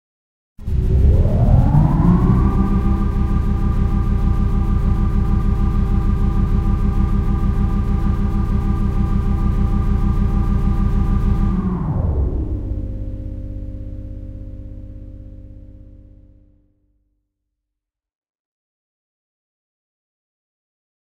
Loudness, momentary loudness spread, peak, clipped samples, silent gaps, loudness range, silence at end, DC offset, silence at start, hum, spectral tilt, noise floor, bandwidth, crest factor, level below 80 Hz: -19 LUFS; 17 LU; -2 dBFS; under 0.1%; none; 17 LU; 5.3 s; under 0.1%; 0.6 s; none; -10 dB/octave; -83 dBFS; 4.8 kHz; 16 dB; -20 dBFS